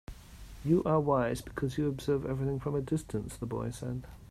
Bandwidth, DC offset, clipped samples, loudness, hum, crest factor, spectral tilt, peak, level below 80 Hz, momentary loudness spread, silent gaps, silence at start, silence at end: 15 kHz; under 0.1%; under 0.1%; -33 LUFS; none; 18 dB; -7.5 dB/octave; -14 dBFS; -50 dBFS; 13 LU; none; 0.1 s; 0.05 s